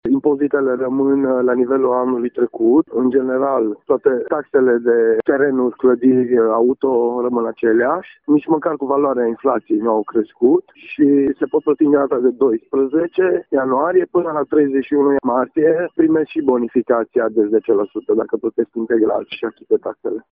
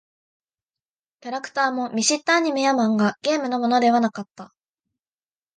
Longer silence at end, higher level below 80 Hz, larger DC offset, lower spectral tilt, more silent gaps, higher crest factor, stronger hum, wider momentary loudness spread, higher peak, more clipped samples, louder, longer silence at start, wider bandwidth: second, 0.15 s vs 1.1 s; first, -58 dBFS vs -74 dBFS; neither; first, -6 dB/octave vs -3.5 dB/octave; neither; about the same, 14 dB vs 18 dB; neither; second, 5 LU vs 14 LU; first, -2 dBFS vs -6 dBFS; neither; first, -17 LUFS vs -21 LUFS; second, 0.05 s vs 1.25 s; second, 3.7 kHz vs 9.8 kHz